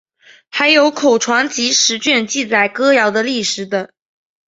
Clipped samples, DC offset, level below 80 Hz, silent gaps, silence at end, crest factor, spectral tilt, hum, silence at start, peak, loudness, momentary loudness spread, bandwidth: under 0.1%; under 0.1%; -64 dBFS; none; 0.65 s; 14 dB; -1.5 dB/octave; none; 0.55 s; 0 dBFS; -14 LUFS; 10 LU; 8 kHz